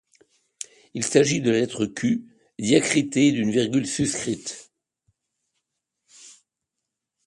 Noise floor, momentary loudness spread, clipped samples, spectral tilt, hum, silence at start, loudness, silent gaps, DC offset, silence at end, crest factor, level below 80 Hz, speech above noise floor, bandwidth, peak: -84 dBFS; 16 LU; under 0.1%; -4.5 dB/octave; none; 0.95 s; -22 LUFS; none; under 0.1%; 0.95 s; 22 dB; -62 dBFS; 62 dB; 11.5 kHz; -4 dBFS